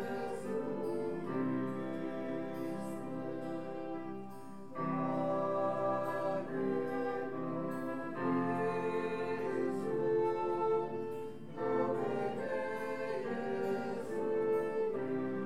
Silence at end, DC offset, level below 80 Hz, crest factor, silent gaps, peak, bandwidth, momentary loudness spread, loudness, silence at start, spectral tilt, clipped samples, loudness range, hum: 0 s; 0.4%; -80 dBFS; 14 dB; none; -22 dBFS; 15 kHz; 8 LU; -37 LUFS; 0 s; -7.5 dB/octave; under 0.1%; 4 LU; none